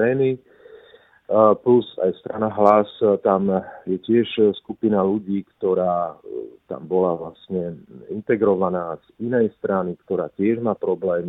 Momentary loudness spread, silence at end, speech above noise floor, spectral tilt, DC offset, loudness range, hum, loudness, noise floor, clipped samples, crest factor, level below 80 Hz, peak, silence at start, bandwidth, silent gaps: 15 LU; 0 s; 31 dB; -9.5 dB/octave; under 0.1%; 5 LU; none; -21 LUFS; -51 dBFS; under 0.1%; 20 dB; -62 dBFS; 0 dBFS; 0 s; 4.1 kHz; none